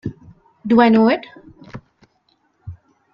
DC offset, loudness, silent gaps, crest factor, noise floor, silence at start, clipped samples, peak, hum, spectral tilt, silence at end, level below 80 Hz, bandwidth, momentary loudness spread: under 0.1%; -15 LUFS; none; 20 dB; -63 dBFS; 0.05 s; under 0.1%; 0 dBFS; none; -8.5 dB/octave; 0.4 s; -54 dBFS; 5.6 kHz; 27 LU